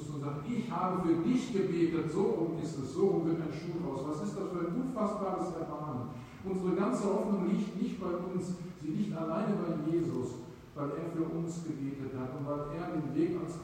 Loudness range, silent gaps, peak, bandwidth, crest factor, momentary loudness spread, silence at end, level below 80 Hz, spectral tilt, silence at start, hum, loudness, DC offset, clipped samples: 5 LU; none; -18 dBFS; 15.5 kHz; 16 dB; 8 LU; 0 s; -62 dBFS; -7.5 dB/octave; 0 s; none; -34 LUFS; under 0.1%; under 0.1%